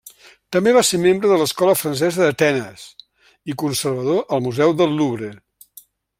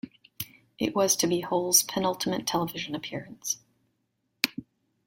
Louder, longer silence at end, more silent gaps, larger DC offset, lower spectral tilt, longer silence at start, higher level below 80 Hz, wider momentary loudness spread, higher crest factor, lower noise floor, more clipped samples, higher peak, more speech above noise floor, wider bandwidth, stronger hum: first, -18 LUFS vs -27 LUFS; first, 0.85 s vs 0.45 s; neither; neither; first, -4.5 dB/octave vs -2.5 dB/octave; about the same, 0.05 s vs 0.05 s; first, -60 dBFS vs -66 dBFS; second, 15 LU vs 18 LU; second, 18 dB vs 28 dB; second, -48 dBFS vs -77 dBFS; neither; about the same, -2 dBFS vs -2 dBFS; second, 31 dB vs 49 dB; about the same, 16.5 kHz vs 16.5 kHz; neither